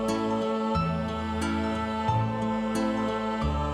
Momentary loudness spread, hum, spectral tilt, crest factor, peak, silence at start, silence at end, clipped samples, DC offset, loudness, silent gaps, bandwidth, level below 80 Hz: 2 LU; none; -6.5 dB/octave; 14 dB; -14 dBFS; 0 s; 0 s; under 0.1%; under 0.1%; -28 LUFS; none; 13 kHz; -42 dBFS